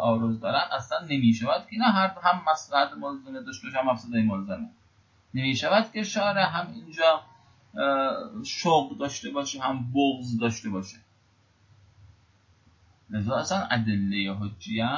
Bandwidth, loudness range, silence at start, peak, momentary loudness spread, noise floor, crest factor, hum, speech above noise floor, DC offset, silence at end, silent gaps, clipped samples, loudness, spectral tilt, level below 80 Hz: 7.6 kHz; 6 LU; 0 s; -8 dBFS; 12 LU; -63 dBFS; 20 dB; none; 37 dB; under 0.1%; 0 s; none; under 0.1%; -27 LUFS; -5 dB/octave; -60 dBFS